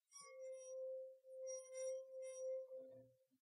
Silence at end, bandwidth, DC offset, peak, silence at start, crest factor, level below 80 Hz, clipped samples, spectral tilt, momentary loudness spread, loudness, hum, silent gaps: 0.3 s; 11.5 kHz; under 0.1%; -40 dBFS; 0.1 s; 12 dB; under -90 dBFS; under 0.1%; -1 dB/octave; 9 LU; -52 LUFS; none; none